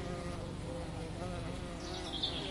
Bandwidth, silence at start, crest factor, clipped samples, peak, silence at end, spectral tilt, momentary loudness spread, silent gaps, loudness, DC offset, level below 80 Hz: 11.5 kHz; 0 s; 18 dB; under 0.1%; -22 dBFS; 0 s; -5 dB/octave; 6 LU; none; -41 LUFS; under 0.1%; -50 dBFS